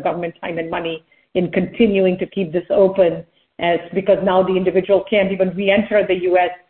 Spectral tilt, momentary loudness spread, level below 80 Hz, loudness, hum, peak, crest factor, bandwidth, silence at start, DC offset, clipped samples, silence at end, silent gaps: -11.5 dB/octave; 10 LU; -52 dBFS; -18 LUFS; none; -2 dBFS; 16 dB; 4.3 kHz; 0 s; under 0.1%; under 0.1%; 0.15 s; none